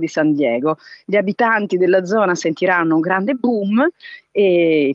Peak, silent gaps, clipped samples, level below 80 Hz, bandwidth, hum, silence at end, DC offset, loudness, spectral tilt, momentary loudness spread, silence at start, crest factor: -2 dBFS; none; under 0.1%; -74 dBFS; 7.8 kHz; none; 0 s; under 0.1%; -17 LUFS; -6 dB/octave; 6 LU; 0 s; 16 dB